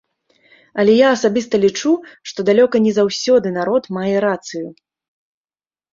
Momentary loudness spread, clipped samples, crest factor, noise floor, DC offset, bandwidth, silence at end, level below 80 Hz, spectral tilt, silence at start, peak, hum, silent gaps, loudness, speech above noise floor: 15 LU; under 0.1%; 16 dB; under -90 dBFS; under 0.1%; 7.6 kHz; 1.2 s; -60 dBFS; -5 dB/octave; 0.75 s; -2 dBFS; none; none; -16 LUFS; over 74 dB